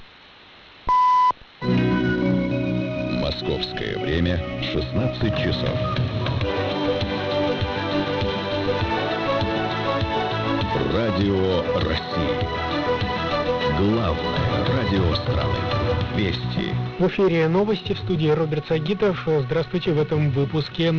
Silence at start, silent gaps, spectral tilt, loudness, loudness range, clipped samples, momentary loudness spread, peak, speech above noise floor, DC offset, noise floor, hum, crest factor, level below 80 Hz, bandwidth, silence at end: 0 s; none; -7.5 dB/octave; -22 LUFS; 2 LU; under 0.1%; 4 LU; -10 dBFS; 26 dB; under 0.1%; -47 dBFS; none; 12 dB; -40 dBFS; 6 kHz; 0 s